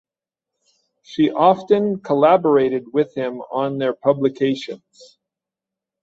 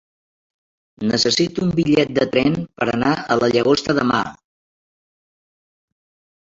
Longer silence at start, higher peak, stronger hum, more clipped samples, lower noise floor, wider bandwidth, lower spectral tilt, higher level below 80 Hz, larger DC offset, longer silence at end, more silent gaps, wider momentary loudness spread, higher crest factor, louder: about the same, 1.1 s vs 1 s; about the same, -2 dBFS vs -2 dBFS; neither; neither; about the same, -87 dBFS vs under -90 dBFS; about the same, 7.6 kHz vs 7.8 kHz; first, -7.5 dB/octave vs -5 dB/octave; second, -64 dBFS vs -52 dBFS; neither; second, 1.25 s vs 2.15 s; neither; first, 12 LU vs 6 LU; about the same, 18 dB vs 18 dB; about the same, -18 LUFS vs -18 LUFS